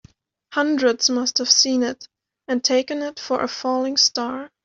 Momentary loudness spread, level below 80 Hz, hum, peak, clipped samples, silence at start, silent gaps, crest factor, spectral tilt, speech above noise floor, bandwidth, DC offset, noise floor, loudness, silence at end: 12 LU; -66 dBFS; none; -2 dBFS; under 0.1%; 0.5 s; none; 20 dB; -0.5 dB/octave; 31 dB; 7.8 kHz; under 0.1%; -52 dBFS; -20 LUFS; 0.2 s